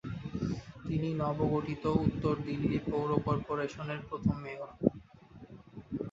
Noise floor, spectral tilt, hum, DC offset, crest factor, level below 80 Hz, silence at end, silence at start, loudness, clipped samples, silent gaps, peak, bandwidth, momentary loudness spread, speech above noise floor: -54 dBFS; -8.5 dB/octave; none; under 0.1%; 26 dB; -52 dBFS; 0 s; 0.05 s; -34 LUFS; under 0.1%; none; -8 dBFS; 7.8 kHz; 12 LU; 22 dB